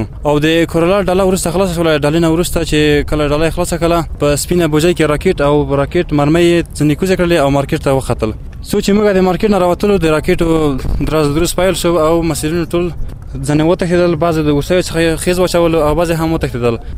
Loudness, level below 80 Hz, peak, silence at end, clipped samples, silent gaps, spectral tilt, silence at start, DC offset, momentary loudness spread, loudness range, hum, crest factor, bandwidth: -13 LUFS; -26 dBFS; 0 dBFS; 0 s; under 0.1%; none; -5.5 dB/octave; 0 s; under 0.1%; 5 LU; 2 LU; none; 12 dB; 16 kHz